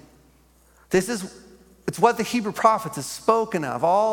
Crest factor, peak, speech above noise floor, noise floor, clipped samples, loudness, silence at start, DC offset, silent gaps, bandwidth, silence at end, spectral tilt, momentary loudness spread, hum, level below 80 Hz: 22 dB; -2 dBFS; 35 dB; -57 dBFS; under 0.1%; -23 LUFS; 0.9 s; under 0.1%; none; 17.5 kHz; 0 s; -4.5 dB/octave; 11 LU; none; -58 dBFS